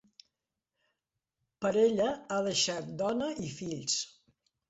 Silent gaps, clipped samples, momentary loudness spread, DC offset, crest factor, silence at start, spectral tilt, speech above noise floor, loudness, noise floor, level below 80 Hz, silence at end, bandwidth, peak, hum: none; under 0.1%; 10 LU; under 0.1%; 18 dB; 1.6 s; -3.5 dB/octave; 57 dB; -31 LUFS; -88 dBFS; -70 dBFS; 0.6 s; 8 kHz; -14 dBFS; none